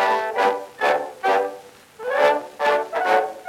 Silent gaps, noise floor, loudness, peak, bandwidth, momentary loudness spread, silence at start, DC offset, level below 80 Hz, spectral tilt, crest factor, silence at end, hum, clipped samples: none; -41 dBFS; -21 LUFS; -4 dBFS; 16.5 kHz; 7 LU; 0 s; under 0.1%; -72 dBFS; -2.5 dB/octave; 18 dB; 0 s; none; under 0.1%